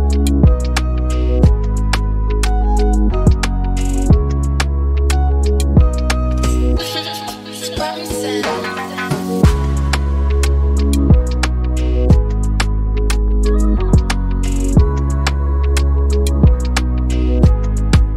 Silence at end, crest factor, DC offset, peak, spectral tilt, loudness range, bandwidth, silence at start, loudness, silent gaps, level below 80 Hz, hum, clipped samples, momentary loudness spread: 0 s; 12 dB; under 0.1%; 0 dBFS; -6 dB/octave; 3 LU; 14 kHz; 0 s; -16 LUFS; none; -14 dBFS; none; under 0.1%; 6 LU